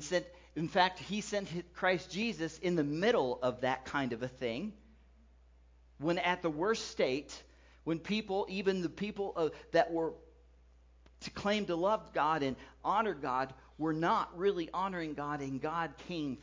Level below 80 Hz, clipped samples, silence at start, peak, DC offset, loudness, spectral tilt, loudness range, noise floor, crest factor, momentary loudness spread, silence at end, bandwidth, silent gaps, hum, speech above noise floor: -62 dBFS; under 0.1%; 0 s; -12 dBFS; under 0.1%; -35 LUFS; -5 dB/octave; 3 LU; -62 dBFS; 22 dB; 8 LU; 0 s; 7.6 kHz; none; none; 28 dB